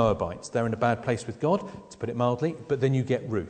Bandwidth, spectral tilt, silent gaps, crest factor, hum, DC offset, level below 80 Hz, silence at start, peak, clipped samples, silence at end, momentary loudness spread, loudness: 9.4 kHz; -7 dB/octave; none; 18 dB; none; under 0.1%; -52 dBFS; 0 s; -8 dBFS; under 0.1%; 0 s; 5 LU; -28 LUFS